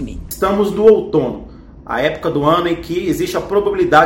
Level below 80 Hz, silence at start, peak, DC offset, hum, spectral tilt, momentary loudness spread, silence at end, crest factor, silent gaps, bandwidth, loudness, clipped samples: -38 dBFS; 0 s; 0 dBFS; under 0.1%; none; -5.5 dB/octave; 11 LU; 0 s; 16 dB; none; 17 kHz; -16 LUFS; 0.3%